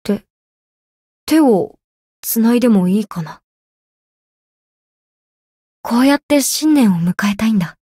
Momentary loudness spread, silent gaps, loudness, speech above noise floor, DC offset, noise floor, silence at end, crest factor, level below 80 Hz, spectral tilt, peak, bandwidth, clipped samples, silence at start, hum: 15 LU; 0.30-1.27 s, 1.84-2.23 s, 3.44-5.84 s, 6.23-6.29 s; -15 LUFS; over 76 dB; under 0.1%; under -90 dBFS; 0.1 s; 14 dB; -54 dBFS; -5 dB/octave; -2 dBFS; 16 kHz; under 0.1%; 0.05 s; none